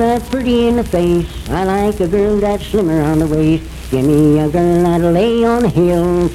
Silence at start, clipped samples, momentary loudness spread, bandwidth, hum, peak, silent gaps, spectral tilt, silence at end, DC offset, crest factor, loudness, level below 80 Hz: 0 s; under 0.1%; 5 LU; 15.5 kHz; none; -2 dBFS; none; -7.5 dB/octave; 0 s; under 0.1%; 12 dB; -14 LUFS; -28 dBFS